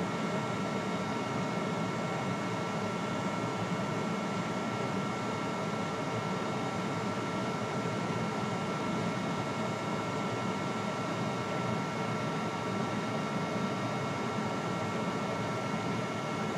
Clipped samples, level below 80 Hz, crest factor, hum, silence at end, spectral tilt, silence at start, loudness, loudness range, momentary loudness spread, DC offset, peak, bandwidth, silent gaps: under 0.1%; -66 dBFS; 14 dB; none; 0 s; -5.5 dB/octave; 0 s; -34 LUFS; 0 LU; 1 LU; under 0.1%; -20 dBFS; 14 kHz; none